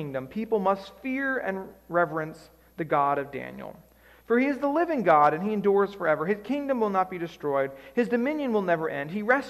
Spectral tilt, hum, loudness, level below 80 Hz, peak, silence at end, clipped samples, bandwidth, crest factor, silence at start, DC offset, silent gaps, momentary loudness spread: -7.5 dB/octave; none; -26 LUFS; -62 dBFS; -8 dBFS; 0 s; under 0.1%; 13.5 kHz; 18 dB; 0 s; under 0.1%; none; 10 LU